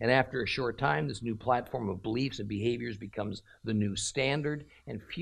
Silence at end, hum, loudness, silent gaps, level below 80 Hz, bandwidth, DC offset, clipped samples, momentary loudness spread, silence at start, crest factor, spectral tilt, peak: 0 s; none; -32 LUFS; none; -58 dBFS; 13.5 kHz; under 0.1%; under 0.1%; 10 LU; 0 s; 20 dB; -5 dB/octave; -12 dBFS